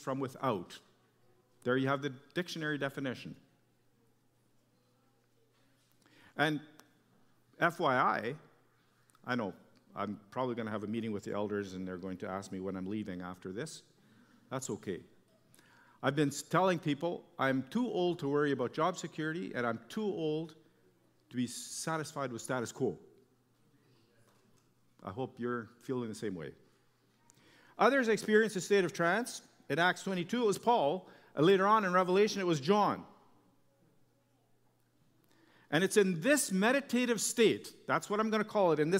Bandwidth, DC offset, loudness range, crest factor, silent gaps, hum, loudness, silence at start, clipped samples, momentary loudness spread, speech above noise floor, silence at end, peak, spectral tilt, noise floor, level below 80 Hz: 16 kHz; under 0.1%; 12 LU; 22 dB; none; none; -33 LUFS; 0 s; under 0.1%; 14 LU; 38 dB; 0 s; -12 dBFS; -4.5 dB/octave; -71 dBFS; -80 dBFS